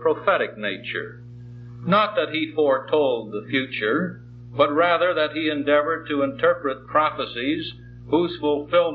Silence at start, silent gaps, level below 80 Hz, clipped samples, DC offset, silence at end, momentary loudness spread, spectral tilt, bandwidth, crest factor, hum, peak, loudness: 0 s; none; -56 dBFS; under 0.1%; under 0.1%; 0 s; 14 LU; -8.5 dB/octave; 5.4 kHz; 18 dB; 60 Hz at -40 dBFS; -6 dBFS; -22 LUFS